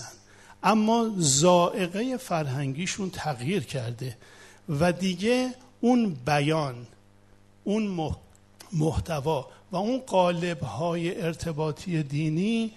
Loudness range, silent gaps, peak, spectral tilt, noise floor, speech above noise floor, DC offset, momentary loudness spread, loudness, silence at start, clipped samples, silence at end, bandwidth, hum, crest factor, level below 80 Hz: 5 LU; none; -6 dBFS; -5 dB/octave; -56 dBFS; 30 dB; under 0.1%; 12 LU; -27 LUFS; 0 s; under 0.1%; 0.05 s; 12.5 kHz; none; 20 dB; -52 dBFS